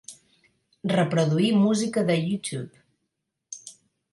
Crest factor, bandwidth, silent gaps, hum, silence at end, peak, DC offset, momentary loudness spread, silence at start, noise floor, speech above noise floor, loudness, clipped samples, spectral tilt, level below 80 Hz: 16 dB; 11.5 kHz; none; none; 0.4 s; -10 dBFS; under 0.1%; 21 LU; 0.1 s; -80 dBFS; 57 dB; -24 LUFS; under 0.1%; -6 dB/octave; -68 dBFS